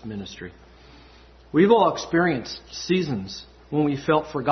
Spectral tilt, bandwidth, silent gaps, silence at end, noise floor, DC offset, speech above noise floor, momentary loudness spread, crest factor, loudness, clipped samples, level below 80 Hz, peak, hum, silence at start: -6 dB/octave; 6.4 kHz; none; 0 s; -50 dBFS; under 0.1%; 27 dB; 19 LU; 18 dB; -22 LUFS; under 0.1%; -52 dBFS; -6 dBFS; none; 0.05 s